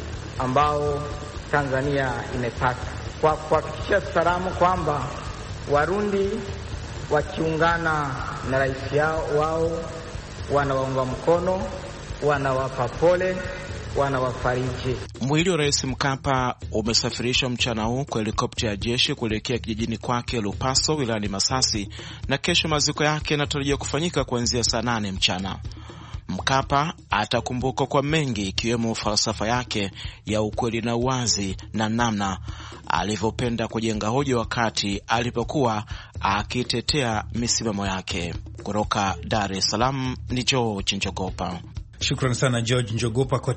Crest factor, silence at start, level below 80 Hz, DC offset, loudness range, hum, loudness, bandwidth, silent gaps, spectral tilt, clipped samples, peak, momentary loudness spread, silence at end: 22 dB; 0 s; -40 dBFS; under 0.1%; 2 LU; none; -24 LUFS; 8.8 kHz; none; -4 dB/octave; under 0.1%; -2 dBFS; 10 LU; 0 s